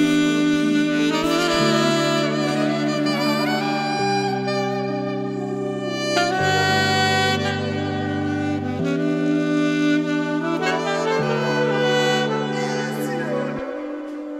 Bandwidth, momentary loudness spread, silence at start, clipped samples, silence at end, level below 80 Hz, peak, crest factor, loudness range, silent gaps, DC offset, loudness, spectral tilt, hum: 15 kHz; 7 LU; 0 s; under 0.1%; 0 s; -58 dBFS; -4 dBFS; 16 dB; 3 LU; none; under 0.1%; -21 LUFS; -5 dB/octave; none